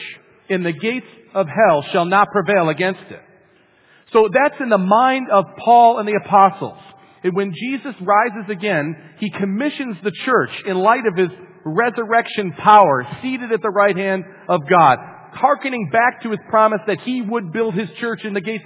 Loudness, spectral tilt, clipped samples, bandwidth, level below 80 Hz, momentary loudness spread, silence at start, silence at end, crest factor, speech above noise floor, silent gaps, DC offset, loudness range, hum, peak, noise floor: -17 LUFS; -9.5 dB/octave; under 0.1%; 4 kHz; -66 dBFS; 12 LU; 0 s; 0.05 s; 18 dB; 37 dB; none; under 0.1%; 5 LU; none; 0 dBFS; -54 dBFS